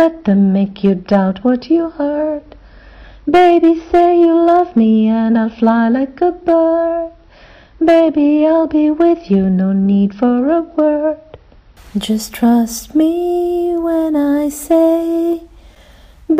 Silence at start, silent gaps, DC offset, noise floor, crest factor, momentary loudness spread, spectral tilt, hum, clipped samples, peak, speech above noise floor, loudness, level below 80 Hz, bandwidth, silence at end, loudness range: 0 s; none; under 0.1%; -43 dBFS; 10 dB; 8 LU; -7 dB/octave; none; under 0.1%; -2 dBFS; 30 dB; -13 LUFS; -44 dBFS; 16 kHz; 0 s; 4 LU